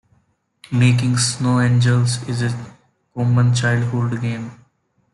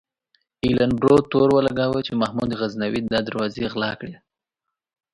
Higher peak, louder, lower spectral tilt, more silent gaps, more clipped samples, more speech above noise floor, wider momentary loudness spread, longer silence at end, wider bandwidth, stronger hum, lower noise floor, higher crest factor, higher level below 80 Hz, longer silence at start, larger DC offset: about the same, -4 dBFS vs -2 dBFS; first, -18 LUFS vs -21 LUFS; second, -5.5 dB/octave vs -7 dB/octave; neither; neither; second, 46 dB vs 63 dB; about the same, 11 LU vs 10 LU; second, 0.6 s vs 1 s; about the same, 11.5 kHz vs 11 kHz; neither; second, -63 dBFS vs -84 dBFS; second, 14 dB vs 20 dB; about the same, -54 dBFS vs -50 dBFS; about the same, 0.7 s vs 0.65 s; neither